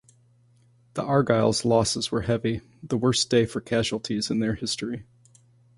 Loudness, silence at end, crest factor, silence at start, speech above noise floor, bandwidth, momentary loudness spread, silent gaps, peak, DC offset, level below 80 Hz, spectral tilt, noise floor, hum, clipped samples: -25 LUFS; 0.75 s; 20 dB; 0.95 s; 35 dB; 11.5 kHz; 11 LU; none; -6 dBFS; under 0.1%; -52 dBFS; -5 dB/octave; -60 dBFS; none; under 0.1%